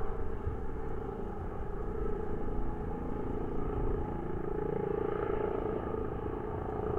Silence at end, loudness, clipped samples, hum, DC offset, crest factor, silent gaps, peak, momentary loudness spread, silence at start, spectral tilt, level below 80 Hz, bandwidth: 0 s; -37 LUFS; under 0.1%; none; under 0.1%; 14 dB; none; -20 dBFS; 6 LU; 0 s; -10 dB/octave; -40 dBFS; 3.4 kHz